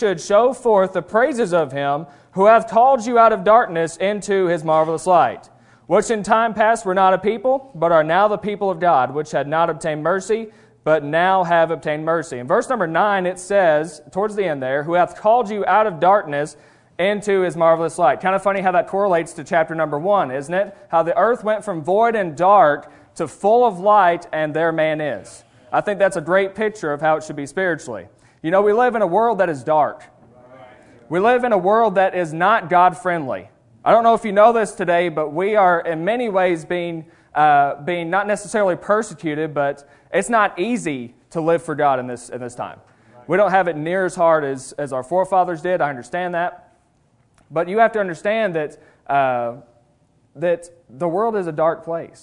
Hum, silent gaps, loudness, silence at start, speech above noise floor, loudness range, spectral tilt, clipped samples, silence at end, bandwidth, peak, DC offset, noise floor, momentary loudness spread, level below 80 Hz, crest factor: none; none; -18 LUFS; 0 s; 42 dB; 5 LU; -5.5 dB/octave; under 0.1%; 0.15 s; 11 kHz; 0 dBFS; under 0.1%; -59 dBFS; 11 LU; -58 dBFS; 18 dB